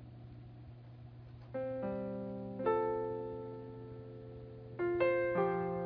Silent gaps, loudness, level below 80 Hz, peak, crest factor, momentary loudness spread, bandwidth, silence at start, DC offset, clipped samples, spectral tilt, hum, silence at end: none; -37 LUFS; -64 dBFS; -20 dBFS; 18 dB; 21 LU; 5.2 kHz; 0 s; under 0.1%; under 0.1%; -7 dB/octave; none; 0 s